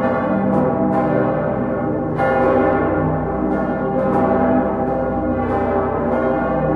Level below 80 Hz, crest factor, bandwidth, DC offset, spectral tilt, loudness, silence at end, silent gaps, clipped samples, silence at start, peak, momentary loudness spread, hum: -36 dBFS; 14 dB; 5 kHz; under 0.1%; -10 dB/octave; -18 LUFS; 0 s; none; under 0.1%; 0 s; -4 dBFS; 4 LU; none